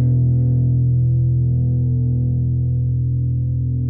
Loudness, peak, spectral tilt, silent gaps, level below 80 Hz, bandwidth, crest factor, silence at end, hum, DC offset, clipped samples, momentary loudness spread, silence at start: -18 LUFS; -8 dBFS; -16.5 dB/octave; none; -30 dBFS; 0.8 kHz; 8 dB; 0 s; none; under 0.1%; under 0.1%; 4 LU; 0 s